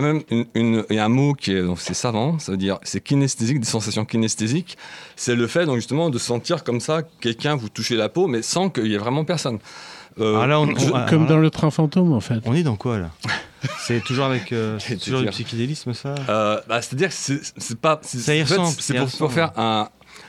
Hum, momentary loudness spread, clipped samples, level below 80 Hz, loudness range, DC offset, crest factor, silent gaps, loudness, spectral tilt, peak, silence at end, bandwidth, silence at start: none; 8 LU; under 0.1%; -56 dBFS; 4 LU; under 0.1%; 16 dB; none; -21 LUFS; -5 dB/octave; -4 dBFS; 0 s; 13 kHz; 0 s